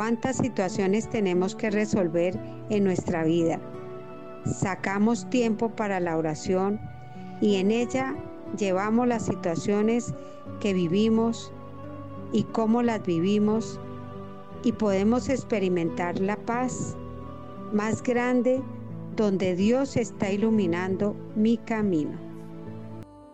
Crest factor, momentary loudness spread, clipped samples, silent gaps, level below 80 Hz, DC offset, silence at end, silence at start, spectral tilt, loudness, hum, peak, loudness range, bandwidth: 14 dB; 16 LU; under 0.1%; none; -56 dBFS; 0.6%; 0 s; 0 s; -6.5 dB/octave; -26 LUFS; none; -12 dBFS; 2 LU; 8.8 kHz